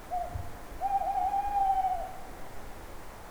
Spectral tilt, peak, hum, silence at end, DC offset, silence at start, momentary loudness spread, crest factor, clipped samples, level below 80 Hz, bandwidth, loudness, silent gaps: -5 dB/octave; -18 dBFS; none; 0 s; under 0.1%; 0 s; 18 LU; 14 dB; under 0.1%; -46 dBFS; over 20 kHz; -31 LUFS; none